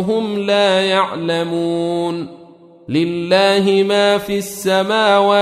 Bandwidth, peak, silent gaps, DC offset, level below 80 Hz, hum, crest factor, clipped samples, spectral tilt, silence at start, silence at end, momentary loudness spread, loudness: 15.5 kHz; -2 dBFS; none; under 0.1%; -58 dBFS; none; 14 dB; under 0.1%; -4.5 dB/octave; 0 s; 0 s; 8 LU; -16 LUFS